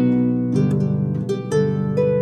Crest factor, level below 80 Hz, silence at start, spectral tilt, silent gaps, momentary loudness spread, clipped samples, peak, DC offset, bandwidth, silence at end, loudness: 12 dB; -58 dBFS; 0 s; -9 dB/octave; none; 3 LU; under 0.1%; -8 dBFS; under 0.1%; 9.2 kHz; 0 s; -20 LUFS